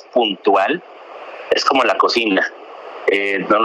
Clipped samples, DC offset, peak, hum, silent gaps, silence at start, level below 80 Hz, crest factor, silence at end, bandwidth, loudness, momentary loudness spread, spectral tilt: under 0.1%; under 0.1%; -4 dBFS; none; none; 0.15 s; -64 dBFS; 14 dB; 0 s; 12 kHz; -17 LUFS; 20 LU; -3.5 dB/octave